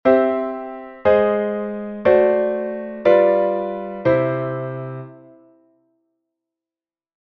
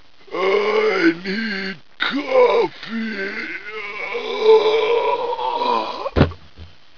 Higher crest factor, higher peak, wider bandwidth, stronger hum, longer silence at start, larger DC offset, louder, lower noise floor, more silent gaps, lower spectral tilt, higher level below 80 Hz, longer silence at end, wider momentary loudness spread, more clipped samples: about the same, 18 dB vs 20 dB; about the same, -2 dBFS vs 0 dBFS; about the same, 5.8 kHz vs 5.4 kHz; neither; second, 0.05 s vs 0.3 s; second, under 0.1% vs 1%; about the same, -19 LUFS vs -19 LUFS; first, under -90 dBFS vs -43 dBFS; neither; first, -9.5 dB/octave vs -6.5 dB/octave; second, -56 dBFS vs -40 dBFS; first, 2.2 s vs 0.3 s; first, 16 LU vs 12 LU; neither